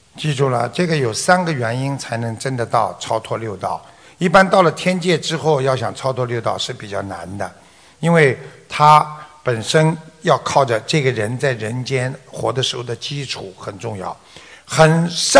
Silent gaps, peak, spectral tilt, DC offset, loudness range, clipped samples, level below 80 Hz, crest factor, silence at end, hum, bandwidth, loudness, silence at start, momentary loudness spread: none; 0 dBFS; -4.5 dB/octave; under 0.1%; 5 LU; 0.2%; -52 dBFS; 18 dB; 0 s; none; 11 kHz; -18 LUFS; 0.15 s; 14 LU